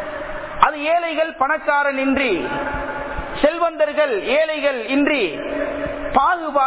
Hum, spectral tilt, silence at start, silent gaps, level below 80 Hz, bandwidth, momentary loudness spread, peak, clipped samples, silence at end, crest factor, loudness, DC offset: none; -8 dB/octave; 0 s; none; -42 dBFS; 4 kHz; 8 LU; 0 dBFS; under 0.1%; 0 s; 20 dB; -19 LUFS; under 0.1%